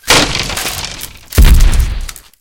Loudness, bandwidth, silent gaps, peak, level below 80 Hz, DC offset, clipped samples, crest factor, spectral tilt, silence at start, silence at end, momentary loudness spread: -13 LUFS; 17.5 kHz; none; 0 dBFS; -12 dBFS; under 0.1%; 1%; 10 dB; -3 dB/octave; 0.05 s; 0.25 s; 16 LU